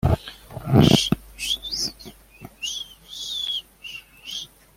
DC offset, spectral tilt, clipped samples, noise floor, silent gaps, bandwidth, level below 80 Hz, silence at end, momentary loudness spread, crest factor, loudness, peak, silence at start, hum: under 0.1%; -5 dB/octave; under 0.1%; -46 dBFS; none; 16.5 kHz; -42 dBFS; 0.3 s; 20 LU; 22 dB; -23 LUFS; -2 dBFS; 0.05 s; none